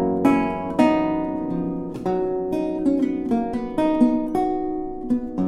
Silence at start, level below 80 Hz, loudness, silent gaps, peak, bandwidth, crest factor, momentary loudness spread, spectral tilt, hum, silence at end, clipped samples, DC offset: 0 s; -46 dBFS; -22 LUFS; none; -4 dBFS; 12 kHz; 18 dB; 7 LU; -8 dB/octave; none; 0 s; under 0.1%; under 0.1%